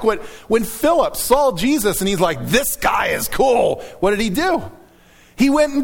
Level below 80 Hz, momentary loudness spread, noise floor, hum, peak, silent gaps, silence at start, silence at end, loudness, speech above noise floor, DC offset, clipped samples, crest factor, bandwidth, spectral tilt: -38 dBFS; 5 LU; -49 dBFS; none; -2 dBFS; none; 0 s; 0 s; -17 LUFS; 32 dB; under 0.1%; under 0.1%; 16 dB; 19 kHz; -4 dB/octave